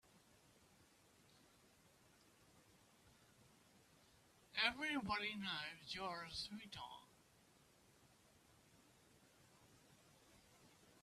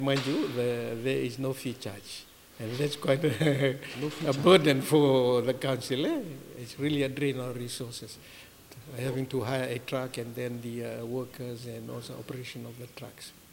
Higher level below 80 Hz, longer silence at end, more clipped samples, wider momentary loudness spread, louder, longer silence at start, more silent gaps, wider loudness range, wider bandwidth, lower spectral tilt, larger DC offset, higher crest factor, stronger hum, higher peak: second, -78 dBFS vs -66 dBFS; second, 0.05 s vs 0.2 s; neither; second, 14 LU vs 20 LU; second, -45 LUFS vs -29 LUFS; first, 0.15 s vs 0 s; neither; first, 13 LU vs 10 LU; second, 14 kHz vs 17 kHz; second, -3 dB/octave vs -5.5 dB/octave; neither; first, 30 dB vs 22 dB; neither; second, -24 dBFS vs -8 dBFS